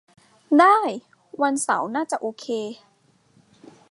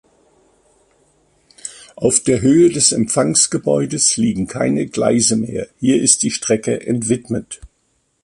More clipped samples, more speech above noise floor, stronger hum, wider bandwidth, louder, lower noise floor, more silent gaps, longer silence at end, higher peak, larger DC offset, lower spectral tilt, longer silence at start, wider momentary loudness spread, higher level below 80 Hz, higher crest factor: neither; second, 40 dB vs 49 dB; neither; about the same, 11.5 kHz vs 11.5 kHz; second, -21 LUFS vs -15 LUFS; second, -60 dBFS vs -64 dBFS; neither; first, 1.15 s vs 0.55 s; about the same, -2 dBFS vs 0 dBFS; neither; about the same, -3.5 dB/octave vs -4 dB/octave; second, 0.5 s vs 1.65 s; first, 17 LU vs 13 LU; second, -78 dBFS vs -48 dBFS; about the same, 20 dB vs 18 dB